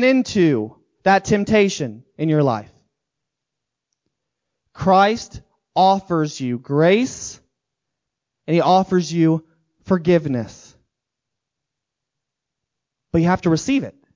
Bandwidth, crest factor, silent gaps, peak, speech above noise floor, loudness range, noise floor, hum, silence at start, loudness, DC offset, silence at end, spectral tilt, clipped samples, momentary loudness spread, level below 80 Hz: 7.6 kHz; 18 dB; none; -2 dBFS; 65 dB; 6 LU; -83 dBFS; none; 0 s; -18 LUFS; under 0.1%; 0.25 s; -6 dB/octave; under 0.1%; 12 LU; -50 dBFS